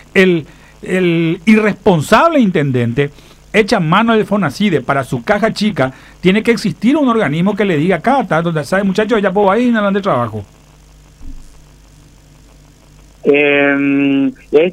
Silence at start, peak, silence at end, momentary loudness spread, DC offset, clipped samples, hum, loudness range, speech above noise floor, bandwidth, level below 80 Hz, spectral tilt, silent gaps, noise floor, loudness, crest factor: 0.15 s; 0 dBFS; 0 s; 6 LU; under 0.1%; under 0.1%; none; 6 LU; 30 dB; 15 kHz; -42 dBFS; -6.5 dB/octave; none; -42 dBFS; -13 LUFS; 14 dB